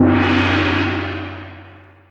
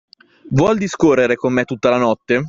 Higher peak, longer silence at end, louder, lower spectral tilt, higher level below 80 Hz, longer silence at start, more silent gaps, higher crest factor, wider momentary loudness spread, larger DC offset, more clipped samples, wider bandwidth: about the same, 0 dBFS vs -2 dBFS; first, 0.35 s vs 0 s; about the same, -17 LUFS vs -16 LUFS; about the same, -7 dB/octave vs -6.5 dB/octave; about the same, -44 dBFS vs -48 dBFS; second, 0 s vs 0.45 s; neither; about the same, 18 dB vs 16 dB; first, 18 LU vs 4 LU; neither; neither; about the same, 7.6 kHz vs 7.8 kHz